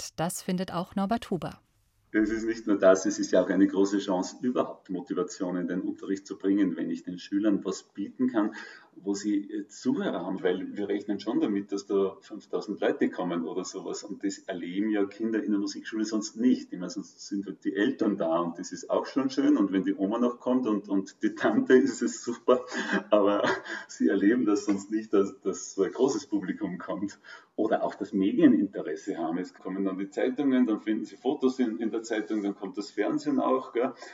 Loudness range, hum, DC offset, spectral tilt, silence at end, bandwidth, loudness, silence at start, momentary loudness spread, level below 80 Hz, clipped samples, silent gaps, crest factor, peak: 5 LU; none; under 0.1%; -5.5 dB/octave; 0 s; 13.5 kHz; -29 LUFS; 0 s; 11 LU; -68 dBFS; under 0.1%; none; 20 dB; -8 dBFS